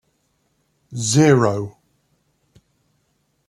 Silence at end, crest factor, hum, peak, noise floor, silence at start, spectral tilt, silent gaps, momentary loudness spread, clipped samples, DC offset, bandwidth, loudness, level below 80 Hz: 1.8 s; 20 dB; none; -2 dBFS; -67 dBFS; 0.9 s; -5.5 dB/octave; none; 20 LU; under 0.1%; under 0.1%; 12.5 kHz; -17 LUFS; -58 dBFS